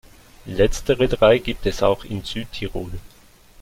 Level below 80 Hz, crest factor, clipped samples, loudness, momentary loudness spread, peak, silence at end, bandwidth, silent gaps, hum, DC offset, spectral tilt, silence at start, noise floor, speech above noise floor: -34 dBFS; 18 dB; under 0.1%; -21 LUFS; 15 LU; -2 dBFS; 0.55 s; 16.5 kHz; none; none; under 0.1%; -5.5 dB/octave; 0.45 s; -49 dBFS; 29 dB